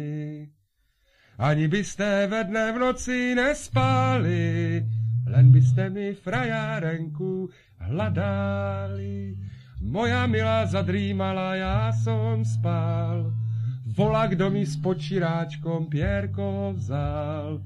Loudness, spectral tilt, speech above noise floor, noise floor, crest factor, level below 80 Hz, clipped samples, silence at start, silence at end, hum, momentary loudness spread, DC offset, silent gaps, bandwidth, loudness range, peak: -25 LUFS; -7 dB/octave; 45 dB; -68 dBFS; 18 dB; -44 dBFS; under 0.1%; 0 s; 0 s; none; 9 LU; under 0.1%; none; 10.5 kHz; 6 LU; -6 dBFS